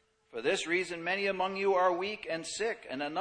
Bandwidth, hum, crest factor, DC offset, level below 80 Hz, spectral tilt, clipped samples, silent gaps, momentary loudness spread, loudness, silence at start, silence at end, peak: 10 kHz; none; 16 dB; under 0.1%; -70 dBFS; -3 dB/octave; under 0.1%; none; 8 LU; -32 LUFS; 0.35 s; 0 s; -16 dBFS